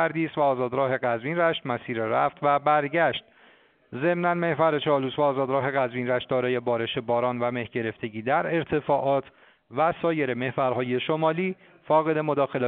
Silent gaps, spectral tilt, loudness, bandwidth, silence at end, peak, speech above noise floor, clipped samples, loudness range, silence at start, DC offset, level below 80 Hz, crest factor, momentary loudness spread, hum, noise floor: none; -4.5 dB/octave; -25 LUFS; 4.5 kHz; 0 s; -8 dBFS; 33 dB; under 0.1%; 2 LU; 0 s; under 0.1%; -64 dBFS; 18 dB; 6 LU; none; -58 dBFS